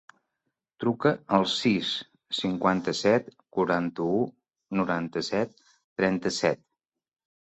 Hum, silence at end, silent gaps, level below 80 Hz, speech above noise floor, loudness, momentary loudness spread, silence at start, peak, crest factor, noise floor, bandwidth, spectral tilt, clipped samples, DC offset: none; 0.9 s; 5.84-5.96 s; -64 dBFS; 59 dB; -27 LUFS; 9 LU; 0.8 s; -6 dBFS; 22 dB; -85 dBFS; 8.2 kHz; -5 dB/octave; under 0.1%; under 0.1%